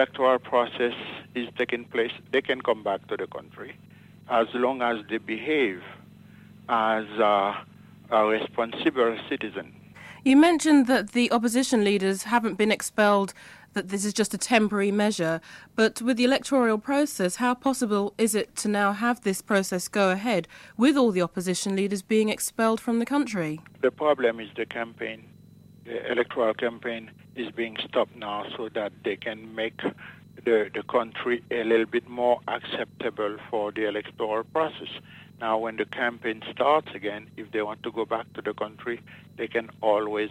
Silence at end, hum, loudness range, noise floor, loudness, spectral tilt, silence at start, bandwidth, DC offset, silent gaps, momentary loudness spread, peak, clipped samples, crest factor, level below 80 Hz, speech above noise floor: 0 s; none; 7 LU; -51 dBFS; -26 LUFS; -4 dB/octave; 0 s; 15.5 kHz; under 0.1%; none; 12 LU; -6 dBFS; under 0.1%; 20 dB; -66 dBFS; 26 dB